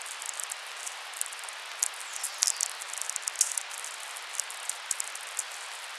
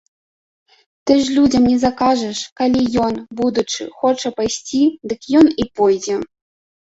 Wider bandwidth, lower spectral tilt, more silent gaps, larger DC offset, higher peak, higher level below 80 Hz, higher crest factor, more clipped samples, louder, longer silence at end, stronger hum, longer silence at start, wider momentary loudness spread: first, 15.5 kHz vs 8 kHz; second, 7 dB/octave vs -4.5 dB/octave; second, none vs 2.52-2.56 s; neither; about the same, -4 dBFS vs -2 dBFS; second, under -90 dBFS vs -46 dBFS; first, 32 dB vs 16 dB; neither; second, -32 LUFS vs -17 LUFS; second, 0 s vs 0.6 s; neither; second, 0 s vs 1.05 s; about the same, 10 LU vs 10 LU